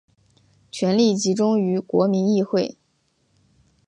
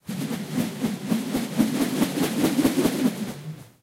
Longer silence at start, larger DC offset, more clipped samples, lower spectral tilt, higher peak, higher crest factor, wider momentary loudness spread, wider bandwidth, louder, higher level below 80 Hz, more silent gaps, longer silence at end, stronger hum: first, 0.75 s vs 0.05 s; neither; neither; about the same, -6 dB/octave vs -5 dB/octave; about the same, -6 dBFS vs -6 dBFS; about the same, 16 dB vs 18 dB; second, 7 LU vs 10 LU; second, 9.6 kHz vs 16 kHz; first, -21 LUFS vs -25 LUFS; second, -68 dBFS vs -54 dBFS; neither; first, 1.15 s vs 0.15 s; neither